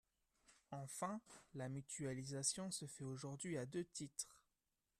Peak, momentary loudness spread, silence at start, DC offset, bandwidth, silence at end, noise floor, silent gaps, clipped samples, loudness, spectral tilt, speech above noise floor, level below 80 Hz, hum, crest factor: -26 dBFS; 12 LU; 0.5 s; under 0.1%; 14 kHz; 0.6 s; under -90 dBFS; none; under 0.1%; -48 LUFS; -4 dB/octave; over 42 dB; -80 dBFS; none; 24 dB